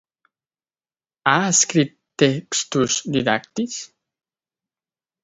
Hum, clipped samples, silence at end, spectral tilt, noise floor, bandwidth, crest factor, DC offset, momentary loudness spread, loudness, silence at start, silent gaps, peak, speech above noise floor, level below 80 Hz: none; under 0.1%; 1.35 s; -3 dB/octave; under -90 dBFS; 8 kHz; 22 dB; under 0.1%; 11 LU; -20 LUFS; 1.25 s; none; 0 dBFS; over 70 dB; -60 dBFS